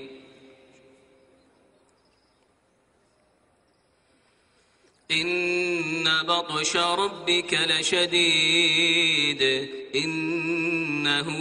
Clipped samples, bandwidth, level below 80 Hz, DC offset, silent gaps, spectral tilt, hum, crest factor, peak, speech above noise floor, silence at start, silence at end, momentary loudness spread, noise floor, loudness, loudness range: under 0.1%; 10.5 kHz; -68 dBFS; under 0.1%; none; -2.5 dB/octave; none; 18 dB; -8 dBFS; 42 dB; 0 s; 0 s; 8 LU; -66 dBFS; -22 LUFS; 9 LU